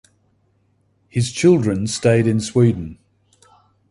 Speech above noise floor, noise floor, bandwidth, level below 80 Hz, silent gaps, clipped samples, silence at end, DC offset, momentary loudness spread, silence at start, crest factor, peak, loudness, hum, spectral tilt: 46 dB; -62 dBFS; 11.5 kHz; -48 dBFS; none; under 0.1%; 0.95 s; under 0.1%; 12 LU; 1.15 s; 18 dB; -2 dBFS; -18 LUFS; none; -6 dB/octave